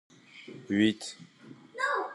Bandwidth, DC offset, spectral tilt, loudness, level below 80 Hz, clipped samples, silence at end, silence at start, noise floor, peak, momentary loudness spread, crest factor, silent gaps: 11.5 kHz; under 0.1%; -4.5 dB/octave; -30 LUFS; -76 dBFS; under 0.1%; 0 s; 0.35 s; -49 dBFS; -12 dBFS; 23 LU; 20 dB; none